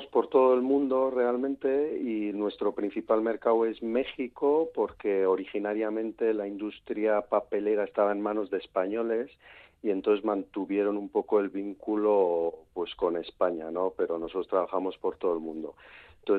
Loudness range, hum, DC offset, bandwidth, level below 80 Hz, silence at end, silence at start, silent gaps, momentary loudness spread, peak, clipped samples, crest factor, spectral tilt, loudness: 2 LU; none; under 0.1%; 4.5 kHz; -66 dBFS; 0 s; 0 s; none; 8 LU; -10 dBFS; under 0.1%; 18 dB; -8.5 dB/octave; -29 LUFS